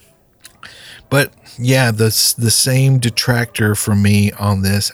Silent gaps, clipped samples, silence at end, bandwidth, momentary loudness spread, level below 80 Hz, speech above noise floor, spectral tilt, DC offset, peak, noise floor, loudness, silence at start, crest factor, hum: none; under 0.1%; 0 s; over 20 kHz; 5 LU; -48 dBFS; 32 dB; -4 dB/octave; under 0.1%; -2 dBFS; -46 dBFS; -14 LUFS; 0.65 s; 14 dB; none